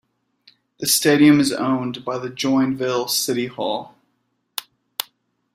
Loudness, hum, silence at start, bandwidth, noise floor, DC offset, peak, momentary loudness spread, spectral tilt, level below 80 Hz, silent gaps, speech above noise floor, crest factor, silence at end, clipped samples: -19 LUFS; none; 0.8 s; 16 kHz; -70 dBFS; under 0.1%; 0 dBFS; 18 LU; -3.5 dB/octave; -62 dBFS; none; 51 dB; 22 dB; 0.55 s; under 0.1%